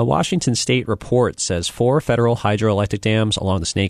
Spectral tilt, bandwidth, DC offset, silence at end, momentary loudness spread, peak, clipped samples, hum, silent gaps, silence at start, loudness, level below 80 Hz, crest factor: -5 dB/octave; 13 kHz; under 0.1%; 0 s; 3 LU; -4 dBFS; under 0.1%; none; none; 0 s; -19 LUFS; -42 dBFS; 14 dB